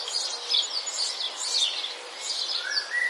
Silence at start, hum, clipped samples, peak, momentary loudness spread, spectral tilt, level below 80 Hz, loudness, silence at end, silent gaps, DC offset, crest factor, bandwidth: 0 s; none; under 0.1%; -12 dBFS; 7 LU; 4.5 dB/octave; under -90 dBFS; -26 LUFS; 0 s; none; under 0.1%; 18 dB; 11.5 kHz